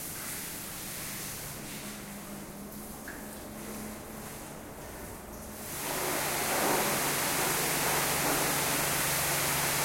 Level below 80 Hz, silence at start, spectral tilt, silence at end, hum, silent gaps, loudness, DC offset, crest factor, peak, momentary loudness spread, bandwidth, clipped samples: -54 dBFS; 0 s; -2 dB/octave; 0 s; none; none; -30 LUFS; under 0.1%; 18 dB; -16 dBFS; 15 LU; 16.5 kHz; under 0.1%